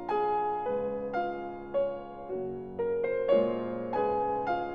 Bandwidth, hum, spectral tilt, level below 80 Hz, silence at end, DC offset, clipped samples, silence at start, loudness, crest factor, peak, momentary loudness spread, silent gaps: 5.4 kHz; none; -8.5 dB/octave; -58 dBFS; 0 s; 0.2%; under 0.1%; 0 s; -31 LUFS; 18 dB; -12 dBFS; 10 LU; none